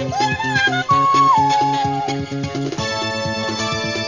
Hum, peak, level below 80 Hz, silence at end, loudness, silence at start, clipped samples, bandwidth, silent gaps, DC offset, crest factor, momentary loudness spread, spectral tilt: none; -4 dBFS; -44 dBFS; 0 s; -18 LUFS; 0 s; under 0.1%; 7.6 kHz; none; 0.1%; 14 dB; 10 LU; -4 dB/octave